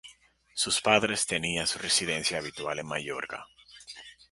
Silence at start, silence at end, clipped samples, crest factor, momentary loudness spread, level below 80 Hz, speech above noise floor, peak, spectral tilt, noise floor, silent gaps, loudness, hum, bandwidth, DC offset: 0.05 s; 0.2 s; under 0.1%; 24 dB; 20 LU; -60 dBFS; 29 dB; -6 dBFS; -1.5 dB/octave; -59 dBFS; none; -28 LUFS; none; 12 kHz; under 0.1%